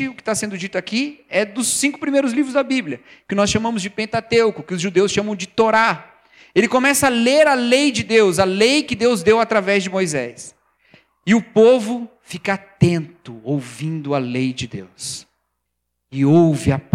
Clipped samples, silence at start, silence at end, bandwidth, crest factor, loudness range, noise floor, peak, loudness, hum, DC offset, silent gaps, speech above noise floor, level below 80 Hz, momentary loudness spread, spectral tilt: under 0.1%; 0 s; 0.15 s; 16 kHz; 18 dB; 7 LU; -76 dBFS; 0 dBFS; -18 LUFS; none; under 0.1%; none; 58 dB; -52 dBFS; 15 LU; -4.5 dB/octave